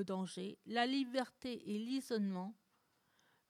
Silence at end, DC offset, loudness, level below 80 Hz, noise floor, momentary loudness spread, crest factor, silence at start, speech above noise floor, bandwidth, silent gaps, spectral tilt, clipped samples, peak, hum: 0.95 s; under 0.1%; -41 LUFS; -84 dBFS; -78 dBFS; 10 LU; 20 dB; 0 s; 38 dB; 15 kHz; none; -5.5 dB/octave; under 0.1%; -22 dBFS; none